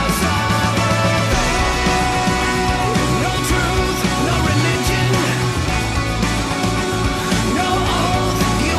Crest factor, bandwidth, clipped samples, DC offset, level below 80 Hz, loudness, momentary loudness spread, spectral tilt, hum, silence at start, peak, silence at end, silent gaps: 10 dB; 13.5 kHz; under 0.1%; under 0.1%; -26 dBFS; -17 LUFS; 3 LU; -4.5 dB/octave; none; 0 s; -6 dBFS; 0 s; none